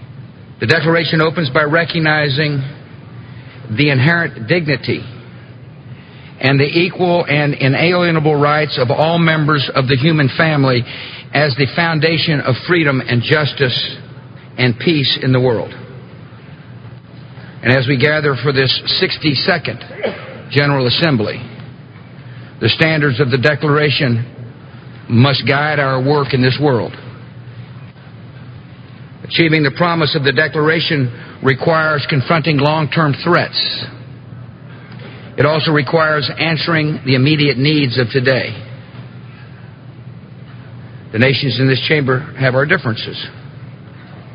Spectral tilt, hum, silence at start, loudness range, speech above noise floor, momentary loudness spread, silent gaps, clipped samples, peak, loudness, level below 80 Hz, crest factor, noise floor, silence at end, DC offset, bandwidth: -8 dB/octave; none; 0 s; 4 LU; 21 dB; 22 LU; none; under 0.1%; 0 dBFS; -14 LUFS; -48 dBFS; 16 dB; -35 dBFS; 0 s; under 0.1%; 6.2 kHz